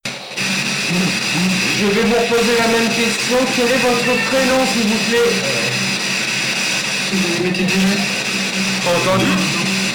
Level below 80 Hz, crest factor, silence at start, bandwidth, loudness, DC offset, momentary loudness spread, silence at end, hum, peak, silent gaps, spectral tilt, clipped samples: -48 dBFS; 6 dB; 0.05 s; 19.5 kHz; -15 LUFS; under 0.1%; 3 LU; 0 s; none; -10 dBFS; none; -3 dB/octave; under 0.1%